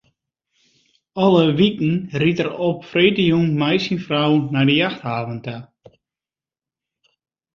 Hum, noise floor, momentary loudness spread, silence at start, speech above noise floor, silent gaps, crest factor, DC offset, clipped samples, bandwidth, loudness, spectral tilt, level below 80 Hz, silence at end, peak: none; under -90 dBFS; 11 LU; 1.15 s; over 72 dB; none; 18 dB; under 0.1%; under 0.1%; 7.2 kHz; -18 LUFS; -7.5 dB/octave; -58 dBFS; 1.9 s; -2 dBFS